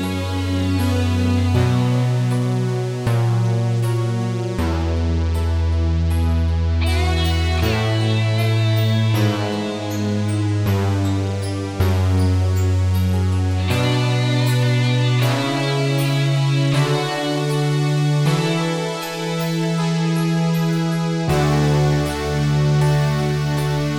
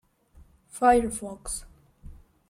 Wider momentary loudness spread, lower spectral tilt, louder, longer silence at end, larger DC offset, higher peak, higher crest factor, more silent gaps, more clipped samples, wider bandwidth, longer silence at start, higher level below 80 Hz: second, 4 LU vs 15 LU; first, -6.5 dB/octave vs -4 dB/octave; first, -19 LUFS vs -26 LUFS; second, 0 s vs 0.35 s; neither; about the same, -6 dBFS vs -8 dBFS; second, 12 dB vs 20 dB; neither; neither; first, 17.5 kHz vs 15.5 kHz; second, 0 s vs 0.75 s; first, -30 dBFS vs -48 dBFS